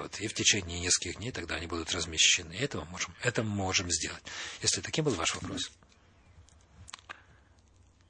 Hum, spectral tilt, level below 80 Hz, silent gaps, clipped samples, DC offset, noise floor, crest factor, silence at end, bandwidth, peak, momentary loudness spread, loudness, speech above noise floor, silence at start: none; -2 dB/octave; -58 dBFS; none; under 0.1%; under 0.1%; -62 dBFS; 22 dB; 0.95 s; 11 kHz; -12 dBFS; 15 LU; -30 LUFS; 30 dB; 0 s